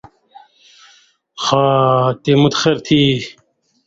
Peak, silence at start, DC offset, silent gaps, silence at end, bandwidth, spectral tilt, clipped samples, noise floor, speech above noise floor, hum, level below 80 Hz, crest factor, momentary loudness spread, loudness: 0 dBFS; 1.35 s; under 0.1%; none; 0.55 s; 7.8 kHz; -5.5 dB/octave; under 0.1%; -52 dBFS; 38 dB; none; -52 dBFS; 16 dB; 8 LU; -14 LUFS